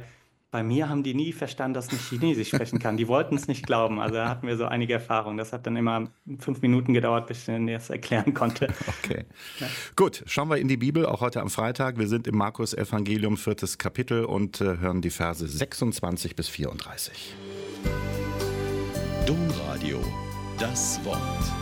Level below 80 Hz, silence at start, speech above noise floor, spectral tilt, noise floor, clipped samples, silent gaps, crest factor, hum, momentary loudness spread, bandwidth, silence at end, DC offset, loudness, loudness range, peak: -44 dBFS; 0 s; 27 dB; -5.5 dB/octave; -54 dBFS; under 0.1%; none; 18 dB; none; 8 LU; 17 kHz; 0 s; under 0.1%; -28 LUFS; 4 LU; -10 dBFS